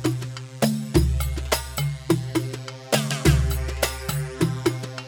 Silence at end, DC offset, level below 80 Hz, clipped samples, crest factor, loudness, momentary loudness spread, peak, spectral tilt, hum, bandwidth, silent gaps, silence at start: 0 s; under 0.1%; -30 dBFS; under 0.1%; 18 dB; -24 LUFS; 8 LU; -6 dBFS; -5 dB/octave; none; over 20 kHz; none; 0 s